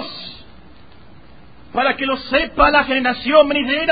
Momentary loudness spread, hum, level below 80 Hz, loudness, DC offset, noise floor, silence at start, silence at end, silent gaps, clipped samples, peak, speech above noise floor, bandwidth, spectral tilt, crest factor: 15 LU; none; -38 dBFS; -16 LUFS; 0.8%; -45 dBFS; 0 s; 0 s; none; under 0.1%; 0 dBFS; 29 dB; 5 kHz; -9 dB/octave; 18 dB